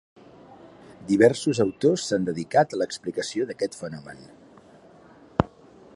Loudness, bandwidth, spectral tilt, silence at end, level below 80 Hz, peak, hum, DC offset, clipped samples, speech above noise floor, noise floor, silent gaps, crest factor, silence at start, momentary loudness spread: -24 LUFS; 11.5 kHz; -5.5 dB/octave; 0.5 s; -52 dBFS; 0 dBFS; none; under 0.1%; under 0.1%; 28 dB; -51 dBFS; none; 26 dB; 0.5 s; 18 LU